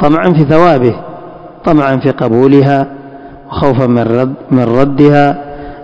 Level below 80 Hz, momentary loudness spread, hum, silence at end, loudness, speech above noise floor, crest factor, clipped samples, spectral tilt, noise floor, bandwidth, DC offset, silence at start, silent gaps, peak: -36 dBFS; 16 LU; none; 0 s; -9 LUFS; 22 dB; 10 dB; 3%; -9 dB/octave; -30 dBFS; 8 kHz; under 0.1%; 0 s; none; 0 dBFS